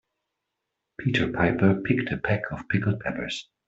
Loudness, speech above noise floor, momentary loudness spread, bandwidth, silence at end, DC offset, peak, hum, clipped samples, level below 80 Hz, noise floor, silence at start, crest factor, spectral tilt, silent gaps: -26 LUFS; 58 dB; 10 LU; 8 kHz; 0.25 s; under 0.1%; -6 dBFS; none; under 0.1%; -52 dBFS; -83 dBFS; 1 s; 20 dB; -7 dB/octave; none